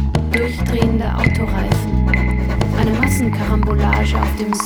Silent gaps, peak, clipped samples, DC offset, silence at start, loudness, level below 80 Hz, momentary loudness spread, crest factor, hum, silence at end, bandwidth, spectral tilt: none; 0 dBFS; under 0.1%; under 0.1%; 0 s; -17 LUFS; -20 dBFS; 3 LU; 16 dB; none; 0 s; 20 kHz; -6.5 dB/octave